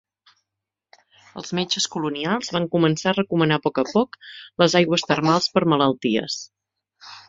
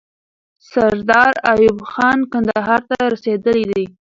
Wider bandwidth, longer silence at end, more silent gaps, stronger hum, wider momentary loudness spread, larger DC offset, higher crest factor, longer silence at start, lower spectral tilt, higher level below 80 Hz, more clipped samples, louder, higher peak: about the same, 7.8 kHz vs 7.6 kHz; second, 0.1 s vs 0.25 s; neither; neither; first, 15 LU vs 6 LU; neither; about the same, 20 dB vs 16 dB; first, 1.35 s vs 0.75 s; second, -4.5 dB/octave vs -6 dB/octave; second, -62 dBFS vs -50 dBFS; neither; second, -21 LUFS vs -15 LUFS; about the same, -2 dBFS vs 0 dBFS